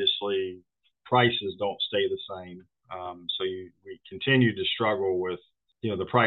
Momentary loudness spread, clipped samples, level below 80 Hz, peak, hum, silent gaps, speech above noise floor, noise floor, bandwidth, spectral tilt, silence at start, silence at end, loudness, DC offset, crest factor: 19 LU; under 0.1%; -70 dBFS; -6 dBFS; none; none; 32 dB; -59 dBFS; 4.4 kHz; -8.5 dB/octave; 0 s; 0 s; -27 LUFS; under 0.1%; 22 dB